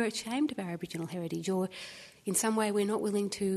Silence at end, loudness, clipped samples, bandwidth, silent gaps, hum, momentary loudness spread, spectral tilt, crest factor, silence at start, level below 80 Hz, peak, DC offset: 0 s; -33 LUFS; under 0.1%; 13.5 kHz; none; none; 9 LU; -4.5 dB/octave; 18 dB; 0 s; -72 dBFS; -16 dBFS; under 0.1%